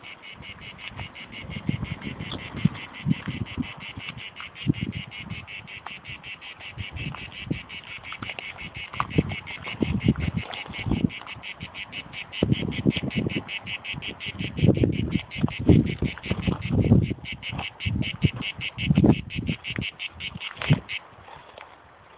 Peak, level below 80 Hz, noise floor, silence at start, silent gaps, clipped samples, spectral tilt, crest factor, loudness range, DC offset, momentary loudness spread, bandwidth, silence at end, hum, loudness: -2 dBFS; -40 dBFS; -50 dBFS; 0 s; none; under 0.1%; -10.5 dB/octave; 24 dB; 9 LU; under 0.1%; 16 LU; 4 kHz; 0 s; none; -28 LUFS